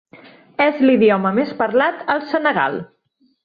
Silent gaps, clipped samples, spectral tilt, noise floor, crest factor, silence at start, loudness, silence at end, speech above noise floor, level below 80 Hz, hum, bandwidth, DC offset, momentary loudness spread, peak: none; under 0.1%; -8.5 dB/octave; -45 dBFS; 16 dB; 0.15 s; -17 LUFS; 0.6 s; 29 dB; -62 dBFS; none; 5 kHz; under 0.1%; 8 LU; -2 dBFS